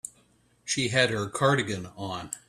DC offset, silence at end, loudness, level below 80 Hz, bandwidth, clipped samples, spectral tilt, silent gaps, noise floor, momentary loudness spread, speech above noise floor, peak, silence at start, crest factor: under 0.1%; 0.1 s; -27 LUFS; -62 dBFS; 14 kHz; under 0.1%; -3.5 dB/octave; none; -64 dBFS; 13 LU; 36 dB; -6 dBFS; 0.05 s; 22 dB